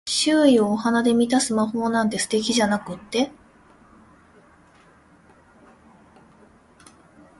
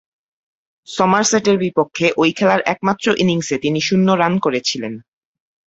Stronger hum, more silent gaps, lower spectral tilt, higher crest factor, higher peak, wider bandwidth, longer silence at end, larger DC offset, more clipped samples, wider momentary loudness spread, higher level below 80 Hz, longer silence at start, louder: neither; neither; about the same, -3.5 dB/octave vs -4.5 dB/octave; about the same, 18 dB vs 16 dB; second, -6 dBFS vs -2 dBFS; first, 11.5 kHz vs 8 kHz; first, 4.1 s vs 0.65 s; neither; neither; about the same, 8 LU vs 7 LU; about the same, -60 dBFS vs -58 dBFS; second, 0.05 s vs 0.9 s; second, -21 LUFS vs -16 LUFS